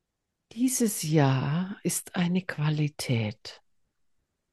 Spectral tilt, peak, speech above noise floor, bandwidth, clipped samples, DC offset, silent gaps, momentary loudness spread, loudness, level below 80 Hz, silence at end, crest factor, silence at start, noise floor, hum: -5 dB/octave; -8 dBFS; 55 dB; 12.5 kHz; under 0.1%; under 0.1%; none; 10 LU; -28 LUFS; -68 dBFS; 0.95 s; 20 dB; 0.55 s; -82 dBFS; none